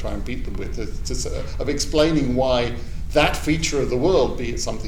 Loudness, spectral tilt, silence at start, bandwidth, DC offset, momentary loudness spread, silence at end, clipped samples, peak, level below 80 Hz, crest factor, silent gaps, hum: -22 LUFS; -4.5 dB/octave; 0 s; 18 kHz; 3%; 12 LU; 0 s; under 0.1%; -6 dBFS; -28 dBFS; 16 dB; none; none